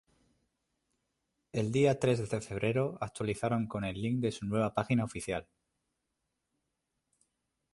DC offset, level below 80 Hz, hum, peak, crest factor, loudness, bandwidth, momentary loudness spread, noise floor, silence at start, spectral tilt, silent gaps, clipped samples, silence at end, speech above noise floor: under 0.1%; -60 dBFS; none; -14 dBFS; 20 dB; -33 LUFS; 11.5 kHz; 9 LU; -84 dBFS; 1.55 s; -6.5 dB/octave; none; under 0.1%; 2.3 s; 52 dB